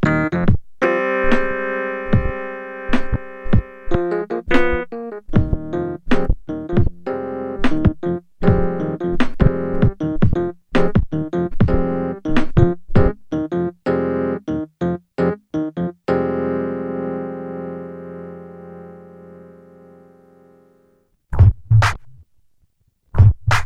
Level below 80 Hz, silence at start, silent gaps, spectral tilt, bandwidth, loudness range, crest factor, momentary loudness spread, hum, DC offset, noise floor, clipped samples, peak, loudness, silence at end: -28 dBFS; 0 s; none; -8 dB/octave; 8.8 kHz; 7 LU; 18 dB; 13 LU; none; under 0.1%; -62 dBFS; under 0.1%; 0 dBFS; -20 LUFS; 0 s